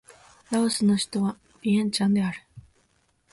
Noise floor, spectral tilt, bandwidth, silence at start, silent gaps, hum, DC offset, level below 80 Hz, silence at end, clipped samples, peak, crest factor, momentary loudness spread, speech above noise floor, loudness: -67 dBFS; -5 dB/octave; 11.5 kHz; 0.5 s; none; none; under 0.1%; -62 dBFS; 0.75 s; under 0.1%; -12 dBFS; 14 dB; 8 LU; 44 dB; -25 LUFS